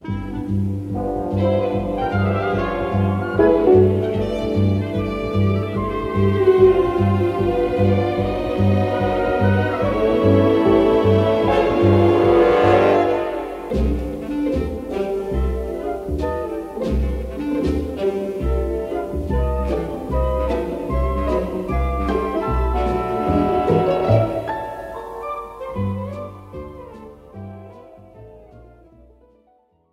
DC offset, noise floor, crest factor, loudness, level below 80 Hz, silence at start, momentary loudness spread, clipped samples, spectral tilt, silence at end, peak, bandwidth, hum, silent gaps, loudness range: under 0.1%; -59 dBFS; 16 dB; -19 LUFS; -30 dBFS; 0.05 s; 13 LU; under 0.1%; -8.5 dB/octave; 1.25 s; -2 dBFS; 12 kHz; none; none; 8 LU